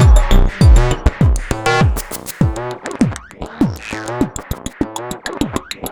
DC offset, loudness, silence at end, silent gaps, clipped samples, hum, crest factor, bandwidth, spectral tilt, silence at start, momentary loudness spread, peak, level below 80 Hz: under 0.1%; -17 LUFS; 0 s; none; under 0.1%; none; 14 dB; over 20 kHz; -6 dB/octave; 0 s; 14 LU; -2 dBFS; -16 dBFS